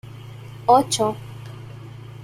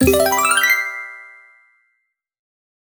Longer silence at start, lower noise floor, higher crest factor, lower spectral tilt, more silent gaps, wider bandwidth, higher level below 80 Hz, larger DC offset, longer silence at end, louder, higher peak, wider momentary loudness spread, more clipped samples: about the same, 0.05 s vs 0 s; second, -38 dBFS vs -72 dBFS; about the same, 20 dB vs 18 dB; first, -4.5 dB/octave vs -3 dB/octave; neither; second, 16 kHz vs over 20 kHz; second, -56 dBFS vs -42 dBFS; neither; second, 0 s vs 1.65 s; second, -19 LUFS vs -15 LUFS; about the same, -2 dBFS vs -2 dBFS; first, 22 LU vs 19 LU; neither